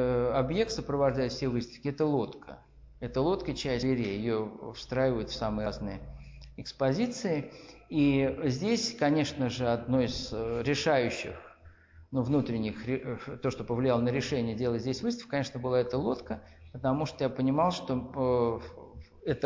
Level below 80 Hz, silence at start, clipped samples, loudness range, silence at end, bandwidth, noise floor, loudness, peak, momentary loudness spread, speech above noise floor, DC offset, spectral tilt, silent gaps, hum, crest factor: -50 dBFS; 0 s; under 0.1%; 3 LU; 0 s; 7.8 kHz; -55 dBFS; -31 LUFS; -16 dBFS; 14 LU; 25 dB; under 0.1%; -6 dB/octave; none; none; 14 dB